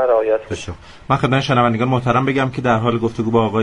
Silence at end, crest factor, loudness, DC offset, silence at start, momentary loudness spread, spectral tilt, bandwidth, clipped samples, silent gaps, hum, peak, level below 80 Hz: 0 s; 16 dB; -17 LUFS; under 0.1%; 0 s; 11 LU; -7 dB/octave; 10.5 kHz; under 0.1%; none; none; 0 dBFS; -44 dBFS